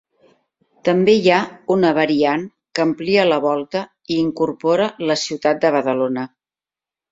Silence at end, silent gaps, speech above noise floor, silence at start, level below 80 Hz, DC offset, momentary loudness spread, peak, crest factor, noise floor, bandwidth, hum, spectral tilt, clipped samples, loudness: 0.85 s; none; over 73 dB; 0.85 s; -60 dBFS; under 0.1%; 10 LU; -2 dBFS; 18 dB; under -90 dBFS; 7.8 kHz; none; -5.5 dB/octave; under 0.1%; -18 LUFS